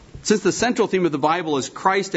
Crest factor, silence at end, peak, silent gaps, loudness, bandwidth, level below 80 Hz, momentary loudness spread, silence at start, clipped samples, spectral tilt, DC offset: 18 dB; 0 s; -4 dBFS; none; -20 LUFS; 8.2 kHz; -52 dBFS; 3 LU; 0.15 s; under 0.1%; -4 dB/octave; under 0.1%